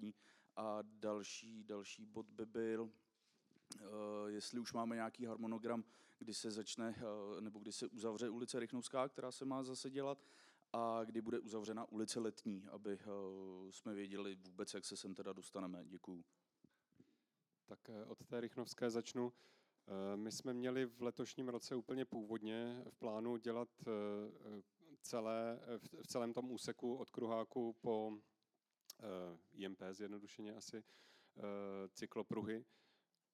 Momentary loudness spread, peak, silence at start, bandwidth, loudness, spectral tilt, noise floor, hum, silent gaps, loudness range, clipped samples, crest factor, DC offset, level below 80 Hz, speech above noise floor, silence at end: 11 LU; -28 dBFS; 0 s; 15 kHz; -47 LUFS; -4.5 dB/octave; -90 dBFS; none; none; 6 LU; under 0.1%; 20 dB; under 0.1%; under -90 dBFS; 43 dB; 0.7 s